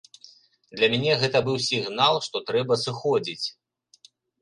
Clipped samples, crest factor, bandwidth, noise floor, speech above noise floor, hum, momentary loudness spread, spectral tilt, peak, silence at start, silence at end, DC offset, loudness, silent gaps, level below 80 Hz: under 0.1%; 20 dB; 11.5 kHz; -57 dBFS; 33 dB; none; 9 LU; -4 dB/octave; -6 dBFS; 0.75 s; 0.9 s; under 0.1%; -24 LUFS; none; -66 dBFS